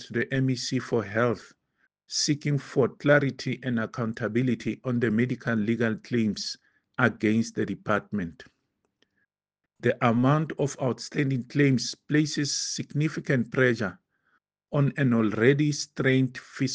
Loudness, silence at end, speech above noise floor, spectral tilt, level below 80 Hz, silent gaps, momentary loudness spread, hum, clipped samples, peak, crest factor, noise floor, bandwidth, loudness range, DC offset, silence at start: -26 LUFS; 0 s; 61 dB; -5.5 dB/octave; -66 dBFS; none; 9 LU; none; under 0.1%; -4 dBFS; 22 dB; -87 dBFS; 9.8 kHz; 3 LU; under 0.1%; 0 s